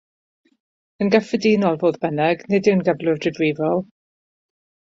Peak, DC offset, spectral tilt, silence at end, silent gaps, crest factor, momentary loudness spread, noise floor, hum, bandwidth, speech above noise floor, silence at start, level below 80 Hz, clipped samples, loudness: -2 dBFS; under 0.1%; -7 dB/octave; 1.05 s; none; 18 dB; 5 LU; under -90 dBFS; none; 7.8 kHz; over 71 dB; 1 s; -62 dBFS; under 0.1%; -20 LUFS